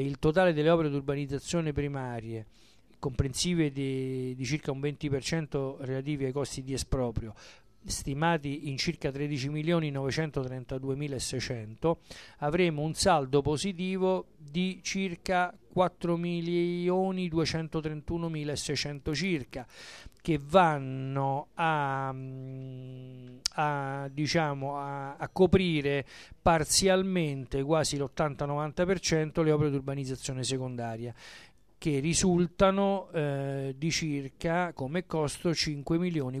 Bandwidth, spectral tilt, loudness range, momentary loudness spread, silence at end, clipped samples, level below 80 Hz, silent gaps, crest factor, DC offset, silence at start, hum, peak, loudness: 14 kHz; -5 dB/octave; 5 LU; 11 LU; 0 s; under 0.1%; -50 dBFS; none; 22 dB; under 0.1%; 0 s; none; -8 dBFS; -30 LUFS